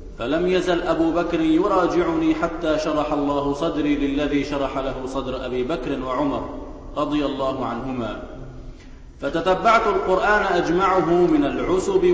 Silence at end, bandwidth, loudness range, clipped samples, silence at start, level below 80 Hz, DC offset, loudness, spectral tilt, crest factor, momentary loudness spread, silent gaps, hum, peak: 0 s; 8 kHz; 6 LU; under 0.1%; 0 s; -40 dBFS; under 0.1%; -21 LUFS; -6 dB/octave; 16 dB; 10 LU; none; none; -6 dBFS